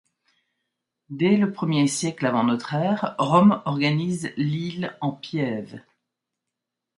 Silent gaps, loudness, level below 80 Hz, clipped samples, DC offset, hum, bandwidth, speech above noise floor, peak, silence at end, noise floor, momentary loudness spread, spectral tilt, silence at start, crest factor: none; -23 LUFS; -68 dBFS; under 0.1%; under 0.1%; none; 11.5 kHz; 62 dB; -4 dBFS; 1.2 s; -84 dBFS; 11 LU; -6 dB/octave; 1.1 s; 20 dB